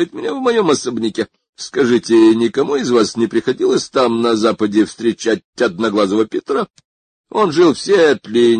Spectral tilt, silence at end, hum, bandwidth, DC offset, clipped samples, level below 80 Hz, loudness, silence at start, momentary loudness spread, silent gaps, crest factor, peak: -5 dB/octave; 0 s; none; 9.6 kHz; under 0.1%; under 0.1%; -56 dBFS; -15 LUFS; 0 s; 8 LU; 1.49-1.53 s, 5.44-5.53 s, 6.85-7.24 s; 14 dB; -2 dBFS